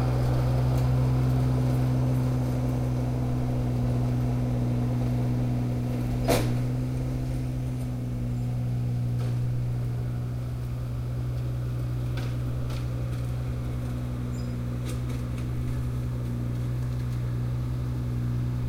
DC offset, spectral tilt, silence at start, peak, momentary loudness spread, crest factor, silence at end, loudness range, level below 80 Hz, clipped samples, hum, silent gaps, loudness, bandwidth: 0.2%; -8 dB/octave; 0 s; -10 dBFS; 7 LU; 18 dB; 0 s; 5 LU; -36 dBFS; under 0.1%; none; none; -28 LUFS; 15.5 kHz